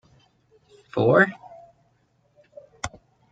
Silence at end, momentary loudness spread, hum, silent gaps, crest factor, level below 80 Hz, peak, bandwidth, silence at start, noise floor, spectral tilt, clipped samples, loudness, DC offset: 0.45 s; 18 LU; none; none; 22 dB; -58 dBFS; -4 dBFS; 9 kHz; 0.95 s; -66 dBFS; -6 dB/octave; under 0.1%; -23 LUFS; under 0.1%